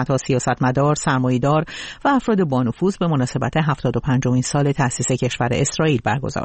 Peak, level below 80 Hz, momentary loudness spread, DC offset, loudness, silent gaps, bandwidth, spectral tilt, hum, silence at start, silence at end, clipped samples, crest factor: -6 dBFS; -44 dBFS; 3 LU; 0.1%; -19 LUFS; none; 8.8 kHz; -5.5 dB/octave; none; 0 s; 0 s; under 0.1%; 14 dB